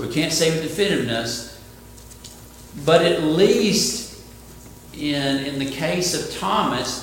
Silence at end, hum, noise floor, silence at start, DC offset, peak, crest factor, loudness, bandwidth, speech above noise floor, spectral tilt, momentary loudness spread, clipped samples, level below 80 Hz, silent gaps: 0 s; none; -42 dBFS; 0 s; under 0.1%; -2 dBFS; 20 dB; -20 LUFS; 17 kHz; 22 dB; -4 dB/octave; 23 LU; under 0.1%; -48 dBFS; none